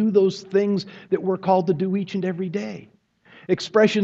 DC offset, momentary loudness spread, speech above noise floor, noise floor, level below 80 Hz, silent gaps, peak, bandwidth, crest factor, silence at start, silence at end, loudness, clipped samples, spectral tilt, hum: under 0.1%; 11 LU; 30 dB; -51 dBFS; -68 dBFS; none; -4 dBFS; 7.8 kHz; 18 dB; 0 s; 0 s; -23 LUFS; under 0.1%; -6.5 dB/octave; none